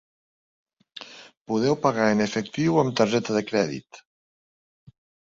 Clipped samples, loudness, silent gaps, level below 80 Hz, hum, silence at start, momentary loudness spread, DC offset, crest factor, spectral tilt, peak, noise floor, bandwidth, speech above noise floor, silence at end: under 0.1%; -23 LUFS; 1.37-1.45 s; -62 dBFS; none; 0.95 s; 20 LU; under 0.1%; 20 dB; -5.5 dB/octave; -6 dBFS; -45 dBFS; 7.8 kHz; 22 dB; 1.35 s